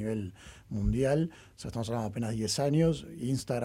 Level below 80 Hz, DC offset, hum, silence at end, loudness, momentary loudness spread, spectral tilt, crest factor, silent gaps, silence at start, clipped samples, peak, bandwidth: -46 dBFS; under 0.1%; none; 0 s; -31 LUFS; 13 LU; -6 dB/octave; 16 dB; none; 0 s; under 0.1%; -16 dBFS; 16 kHz